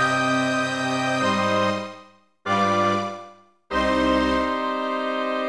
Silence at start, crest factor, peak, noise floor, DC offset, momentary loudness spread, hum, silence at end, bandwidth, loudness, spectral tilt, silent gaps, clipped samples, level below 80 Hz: 0 s; 14 dB; -8 dBFS; -50 dBFS; 0.2%; 9 LU; none; 0 s; 11 kHz; -22 LUFS; -4.5 dB/octave; none; under 0.1%; -46 dBFS